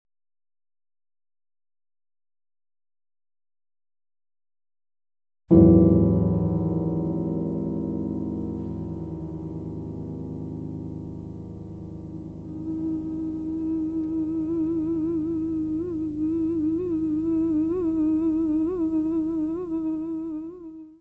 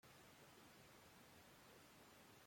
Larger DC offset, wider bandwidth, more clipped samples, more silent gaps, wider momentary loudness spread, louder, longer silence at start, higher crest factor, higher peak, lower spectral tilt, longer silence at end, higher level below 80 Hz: neither; second, 2.7 kHz vs 16.5 kHz; neither; neither; first, 15 LU vs 0 LU; first, -25 LUFS vs -65 LUFS; first, 5.5 s vs 0.05 s; first, 24 dB vs 12 dB; first, -2 dBFS vs -54 dBFS; first, -12.5 dB/octave vs -3 dB/octave; about the same, 0.05 s vs 0 s; first, -44 dBFS vs -86 dBFS